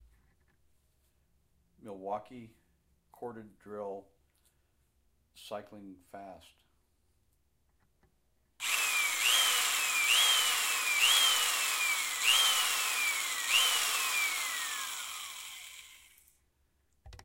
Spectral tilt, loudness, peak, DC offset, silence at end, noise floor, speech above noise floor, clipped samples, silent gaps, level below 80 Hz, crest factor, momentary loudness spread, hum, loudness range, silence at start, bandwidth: 2 dB/octave; -27 LUFS; -14 dBFS; under 0.1%; 0.1 s; -74 dBFS; 30 dB; under 0.1%; none; -70 dBFS; 20 dB; 22 LU; none; 22 LU; 1.85 s; 16 kHz